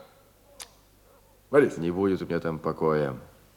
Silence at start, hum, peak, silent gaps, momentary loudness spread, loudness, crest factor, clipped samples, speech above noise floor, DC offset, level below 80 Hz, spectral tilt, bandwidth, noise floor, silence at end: 0.6 s; none; -6 dBFS; none; 22 LU; -26 LUFS; 22 dB; under 0.1%; 33 dB; under 0.1%; -60 dBFS; -7 dB/octave; 17.5 kHz; -58 dBFS; 0.35 s